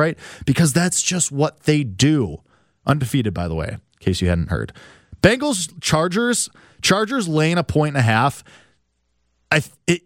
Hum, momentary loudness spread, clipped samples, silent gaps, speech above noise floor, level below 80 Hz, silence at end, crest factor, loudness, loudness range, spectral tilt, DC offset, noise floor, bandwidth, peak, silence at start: none; 10 LU; under 0.1%; none; 49 dB; -42 dBFS; 0.1 s; 20 dB; -19 LUFS; 3 LU; -4.5 dB/octave; under 0.1%; -68 dBFS; 16.5 kHz; 0 dBFS; 0 s